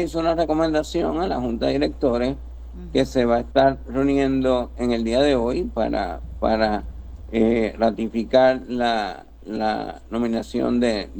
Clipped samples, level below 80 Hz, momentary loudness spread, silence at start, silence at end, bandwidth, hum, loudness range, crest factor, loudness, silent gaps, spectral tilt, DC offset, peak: under 0.1%; -36 dBFS; 10 LU; 0 s; 0 s; 19 kHz; none; 2 LU; 18 dB; -22 LUFS; none; -6 dB/octave; under 0.1%; -4 dBFS